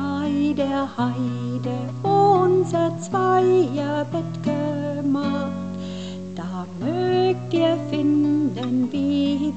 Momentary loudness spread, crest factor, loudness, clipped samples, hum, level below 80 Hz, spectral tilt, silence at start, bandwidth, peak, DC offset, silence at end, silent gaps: 12 LU; 14 dB; -22 LUFS; under 0.1%; none; -64 dBFS; -7.5 dB/octave; 0 s; 8.6 kHz; -6 dBFS; 0.4%; 0 s; none